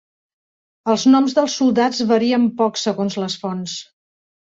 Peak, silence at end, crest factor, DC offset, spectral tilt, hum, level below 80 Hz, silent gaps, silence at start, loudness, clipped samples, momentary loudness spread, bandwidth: -2 dBFS; 0.75 s; 16 dB; under 0.1%; -4.5 dB/octave; none; -64 dBFS; none; 0.85 s; -18 LUFS; under 0.1%; 12 LU; 7.8 kHz